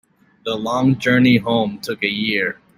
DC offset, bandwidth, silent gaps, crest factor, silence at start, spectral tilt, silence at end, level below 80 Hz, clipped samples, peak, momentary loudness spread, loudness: under 0.1%; 16 kHz; none; 16 dB; 0.45 s; -6 dB/octave; 0.25 s; -54 dBFS; under 0.1%; -2 dBFS; 10 LU; -18 LUFS